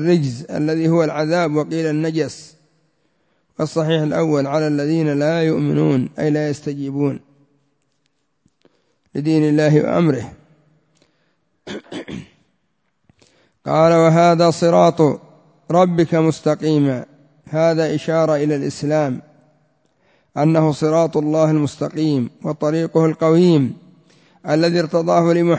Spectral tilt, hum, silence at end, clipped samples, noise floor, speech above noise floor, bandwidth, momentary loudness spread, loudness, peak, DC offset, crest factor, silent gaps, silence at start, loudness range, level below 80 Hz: -7 dB/octave; none; 0 s; under 0.1%; -69 dBFS; 53 dB; 8 kHz; 14 LU; -17 LUFS; 0 dBFS; under 0.1%; 18 dB; none; 0 s; 7 LU; -58 dBFS